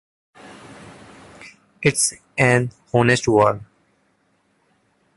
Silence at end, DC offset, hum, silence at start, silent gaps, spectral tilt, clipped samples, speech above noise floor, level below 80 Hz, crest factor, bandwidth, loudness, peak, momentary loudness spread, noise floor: 1.55 s; under 0.1%; none; 0.5 s; none; -4.5 dB/octave; under 0.1%; 47 dB; -54 dBFS; 20 dB; 12 kHz; -18 LUFS; -2 dBFS; 25 LU; -64 dBFS